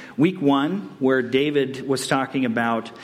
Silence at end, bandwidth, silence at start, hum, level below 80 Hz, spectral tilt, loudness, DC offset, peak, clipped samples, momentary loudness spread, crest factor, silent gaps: 0 s; 15 kHz; 0 s; none; -66 dBFS; -5.5 dB/octave; -22 LUFS; under 0.1%; -6 dBFS; under 0.1%; 5 LU; 16 dB; none